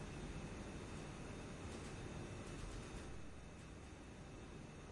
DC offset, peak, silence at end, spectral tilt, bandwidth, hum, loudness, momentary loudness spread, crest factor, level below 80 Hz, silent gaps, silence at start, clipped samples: under 0.1%; -38 dBFS; 0 s; -5 dB/octave; 11.5 kHz; none; -52 LUFS; 6 LU; 14 dB; -58 dBFS; none; 0 s; under 0.1%